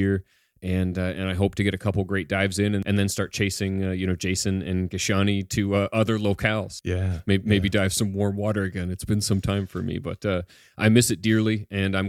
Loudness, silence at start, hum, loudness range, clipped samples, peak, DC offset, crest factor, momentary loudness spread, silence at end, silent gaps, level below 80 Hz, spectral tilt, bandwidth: -24 LUFS; 0 s; none; 1 LU; under 0.1%; -4 dBFS; under 0.1%; 20 dB; 7 LU; 0 s; none; -48 dBFS; -5.5 dB/octave; 15.5 kHz